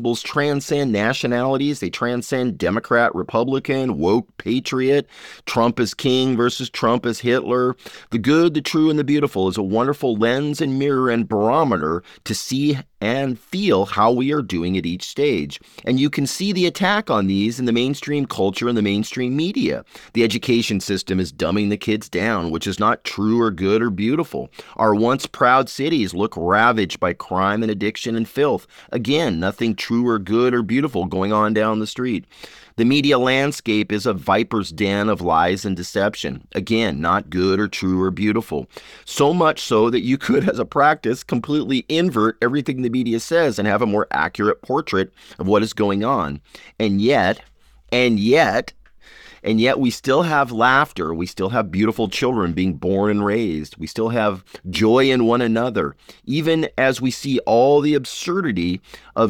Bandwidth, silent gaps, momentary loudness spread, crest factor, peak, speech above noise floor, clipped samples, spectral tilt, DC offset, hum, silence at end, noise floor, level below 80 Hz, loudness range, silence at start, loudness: 18 kHz; none; 8 LU; 18 dB; -2 dBFS; 26 dB; under 0.1%; -5.5 dB/octave; under 0.1%; none; 0 s; -45 dBFS; -50 dBFS; 2 LU; 0 s; -19 LUFS